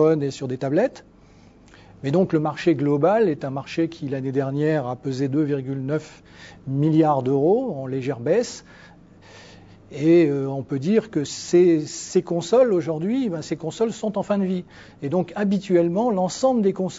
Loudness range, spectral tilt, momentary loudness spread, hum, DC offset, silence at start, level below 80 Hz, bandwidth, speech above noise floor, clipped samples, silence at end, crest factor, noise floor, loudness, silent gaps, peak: 3 LU; -7 dB/octave; 10 LU; none; under 0.1%; 0 s; -60 dBFS; 8 kHz; 29 dB; under 0.1%; 0 s; 16 dB; -50 dBFS; -22 LUFS; none; -6 dBFS